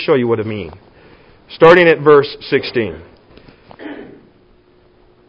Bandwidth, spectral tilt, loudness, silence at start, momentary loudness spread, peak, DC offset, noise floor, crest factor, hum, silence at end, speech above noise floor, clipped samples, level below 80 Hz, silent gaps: 6.4 kHz; -7.5 dB/octave; -12 LUFS; 0 s; 25 LU; 0 dBFS; under 0.1%; -50 dBFS; 16 dB; none; 1.25 s; 38 dB; 0.2%; -48 dBFS; none